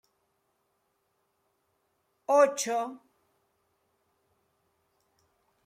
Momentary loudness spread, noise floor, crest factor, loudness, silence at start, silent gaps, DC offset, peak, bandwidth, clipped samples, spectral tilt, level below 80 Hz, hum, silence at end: 17 LU; -76 dBFS; 24 dB; -26 LUFS; 2.3 s; none; under 0.1%; -10 dBFS; 16 kHz; under 0.1%; -2 dB/octave; -88 dBFS; none; 2.7 s